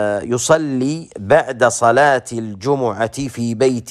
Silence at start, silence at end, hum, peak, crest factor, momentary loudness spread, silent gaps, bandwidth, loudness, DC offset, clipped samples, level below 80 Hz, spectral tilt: 0 s; 0 s; none; 0 dBFS; 16 dB; 10 LU; none; 14.5 kHz; -17 LUFS; under 0.1%; under 0.1%; -52 dBFS; -4.5 dB/octave